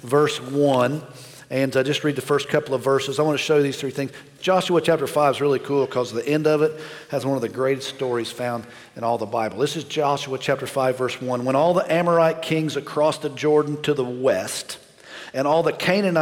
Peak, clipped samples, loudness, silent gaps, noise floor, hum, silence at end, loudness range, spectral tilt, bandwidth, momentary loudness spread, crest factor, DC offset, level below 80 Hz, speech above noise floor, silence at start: -6 dBFS; under 0.1%; -22 LUFS; none; -41 dBFS; none; 0 s; 4 LU; -5 dB/octave; 17 kHz; 10 LU; 16 dB; under 0.1%; -66 dBFS; 19 dB; 0.05 s